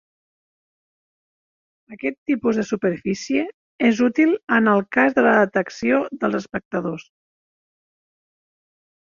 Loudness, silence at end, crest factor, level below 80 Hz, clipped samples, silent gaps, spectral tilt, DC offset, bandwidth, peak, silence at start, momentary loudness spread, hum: -20 LUFS; 2 s; 20 dB; -62 dBFS; under 0.1%; 2.18-2.26 s, 3.54-3.79 s, 6.65-6.71 s; -6 dB/octave; under 0.1%; 7.4 kHz; -2 dBFS; 1.9 s; 11 LU; none